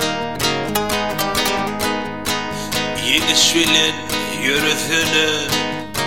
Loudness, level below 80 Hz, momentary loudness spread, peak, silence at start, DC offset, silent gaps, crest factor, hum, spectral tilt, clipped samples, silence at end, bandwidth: -17 LUFS; -44 dBFS; 9 LU; 0 dBFS; 0 s; 1%; none; 18 dB; none; -2 dB/octave; under 0.1%; 0 s; 17 kHz